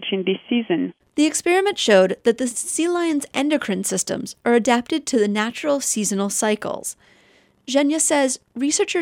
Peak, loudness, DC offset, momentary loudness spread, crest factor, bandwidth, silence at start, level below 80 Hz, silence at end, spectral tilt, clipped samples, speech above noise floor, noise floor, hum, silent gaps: -2 dBFS; -20 LUFS; under 0.1%; 7 LU; 18 dB; 17 kHz; 0 s; -64 dBFS; 0 s; -3 dB/octave; under 0.1%; 36 dB; -56 dBFS; none; none